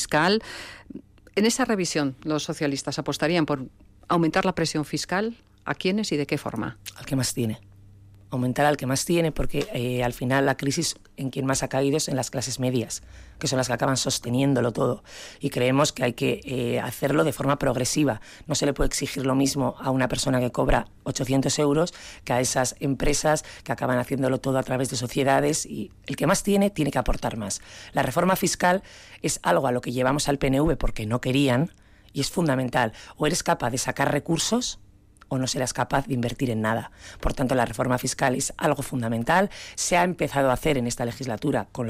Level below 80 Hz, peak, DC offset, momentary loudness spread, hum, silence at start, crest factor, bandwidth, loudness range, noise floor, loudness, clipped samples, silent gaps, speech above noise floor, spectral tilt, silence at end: -40 dBFS; -10 dBFS; under 0.1%; 9 LU; none; 0 s; 14 dB; 16 kHz; 2 LU; -49 dBFS; -25 LUFS; under 0.1%; none; 25 dB; -4.5 dB/octave; 0 s